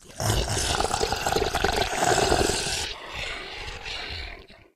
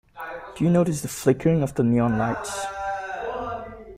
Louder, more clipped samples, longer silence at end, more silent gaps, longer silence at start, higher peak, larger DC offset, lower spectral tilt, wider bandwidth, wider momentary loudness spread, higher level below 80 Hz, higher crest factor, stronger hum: about the same, -26 LUFS vs -24 LUFS; neither; first, 0.2 s vs 0 s; neither; second, 0 s vs 0.15 s; about the same, -6 dBFS vs -6 dBFS; neither; second, -3 dB/octave vs -6.5 dB/octave; about the same, 16 kHz vs 16 kHz; about the same, 12 LU vs 13 LU; first, -38 dBFS vs -50 dBFS; about the same, 20 dB vs 18 dB; neither